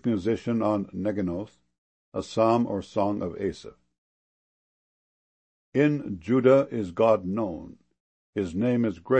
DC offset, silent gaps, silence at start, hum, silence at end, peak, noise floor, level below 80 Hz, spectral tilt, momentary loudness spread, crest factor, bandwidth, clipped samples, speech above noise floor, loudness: under 0.1%; 1.78-2.12 s, 3.98-5.72 s, 8.00-8.33 s; 0.05 s; none; 0 s; -8 dBFS; under -90 dBFS; -60 dBFS; -8 dB/octave; 13 LU; 20 dB; 8.6 kHz; under 0.1%; over 65 dB; -26 LUFS